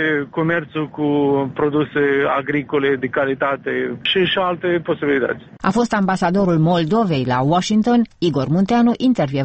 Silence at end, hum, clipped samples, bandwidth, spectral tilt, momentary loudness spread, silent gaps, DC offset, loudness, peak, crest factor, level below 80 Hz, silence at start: 0 s; none; under 0.1%; 8.4 kHz; -6.5 dB/octave; 5 LU; none; under 0.1%; -18 LUFS; -2 dBFS; 14 dB; -50 dBFS; 0 s